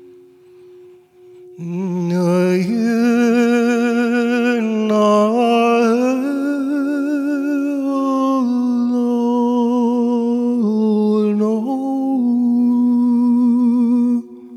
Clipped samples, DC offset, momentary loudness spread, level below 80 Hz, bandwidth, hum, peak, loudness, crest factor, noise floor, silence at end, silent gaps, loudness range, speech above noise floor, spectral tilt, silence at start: under 0.1%; under 0.1%; 5 LU; -74 dBFS; 11.5 kHz; none; -4 dBFS; -16 LUFS; 12 dB; -44 dBFS; 0 s; none; 3 LU; 27 dB; -7 dB/octave; 1.4 s